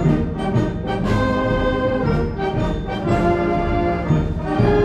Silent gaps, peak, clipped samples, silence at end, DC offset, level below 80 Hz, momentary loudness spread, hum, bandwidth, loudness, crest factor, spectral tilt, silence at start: none; -4 dBFS; under 0.1%; 0 s; under 0.1%; -28 dBFS; 4 LU; none; 9.4 kHz; -20 LUFS; 14 dB; -8 dB/octave; 0 s